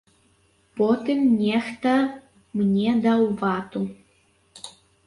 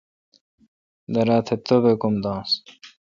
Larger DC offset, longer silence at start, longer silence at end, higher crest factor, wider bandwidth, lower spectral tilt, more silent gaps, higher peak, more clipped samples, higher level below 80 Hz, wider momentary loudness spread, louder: neither; second, 0.75 s vs 1.1 s; first, 0.35 s vs 0.2 s; about the same, 14 dB vs 18 dB; first, 11.5 kHz vs 7.4 kHz; about the same, -7 dB/octave vs -7 dB/octave; neither; second, -10 dBFS vs -4 dBFS; neither; about the same, -62 dBFS vs -58 dBFS; first, 21 LU vs 7 LU; about the same, -23 LUFS vs -21 LUFS